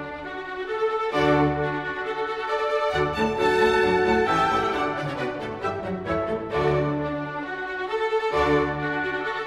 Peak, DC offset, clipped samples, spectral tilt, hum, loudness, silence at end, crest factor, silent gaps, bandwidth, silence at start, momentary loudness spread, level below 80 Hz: -8 dBFS; under 0.1%; under 0.1%; -6 dB/octave; none; -24 LUFS; 0 s; 16 dB; none; 12.5 kHz; 0 s; 10 LU; -46 dBFS